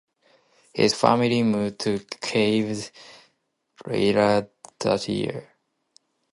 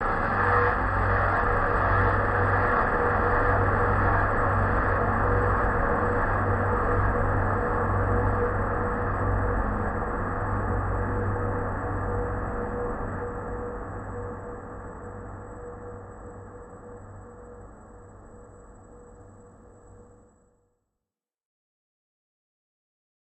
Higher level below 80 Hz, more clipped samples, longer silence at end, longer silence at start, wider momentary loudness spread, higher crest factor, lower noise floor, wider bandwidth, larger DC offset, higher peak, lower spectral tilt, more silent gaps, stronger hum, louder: second, -60 dBFS vs -34 dBFS; neither; second, 0.9 s vs 3.2 s; first, 0.75 s vs 0 s; about the same, 16 LU vs 18 LU; first, 24 dB vs 16 dB; second, -72 dBFS vs -90 dBFS; first, 11.5 kHz vs 8.2 kHz; neither; first, -2 dBFS vs -10 dBFS; second, -5 dB/octave vs -9 dB/octave; neither; neither; first, -23 LUFS vs -26 LUFS